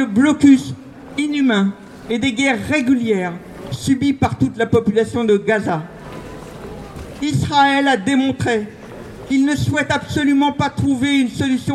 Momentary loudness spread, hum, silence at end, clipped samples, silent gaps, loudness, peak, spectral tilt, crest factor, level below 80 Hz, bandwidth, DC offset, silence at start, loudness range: 19 LU; none; 0 s; under 0.1%; none; -17 LUFS; 0 dBFS; -5.5 dB/octave; 16 dB; -44 dBFS; 12.5 kHz; under 0.1%; 0 s; 2 LU